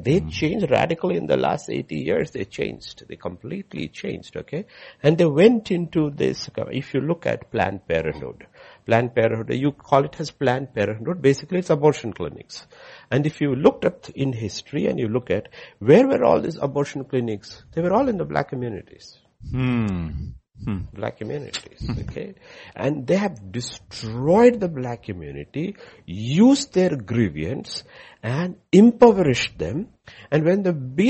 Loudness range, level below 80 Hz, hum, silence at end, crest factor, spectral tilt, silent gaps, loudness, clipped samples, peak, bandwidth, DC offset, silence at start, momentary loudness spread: 8 LU; -48 dBFS; none; 0 s; 20 dB; -6.5 dB/octave; none; -22 LUFS; under 0.1%; -2 dBFS; 8.4 kHz; under 0.1%; 0 s; 17 LU